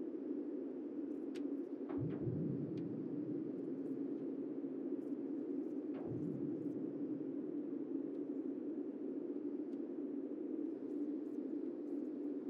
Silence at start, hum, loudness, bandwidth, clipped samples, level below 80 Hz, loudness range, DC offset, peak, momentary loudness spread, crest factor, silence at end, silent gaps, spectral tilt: 0 s; none; -43 LUFS; 5 kHz; under 0.1%; -80 dBFS; 1 LU; under 0.1%; -30 dBFS; 2 LU; 12 dB; 0 s; none; -10.5 dB/octave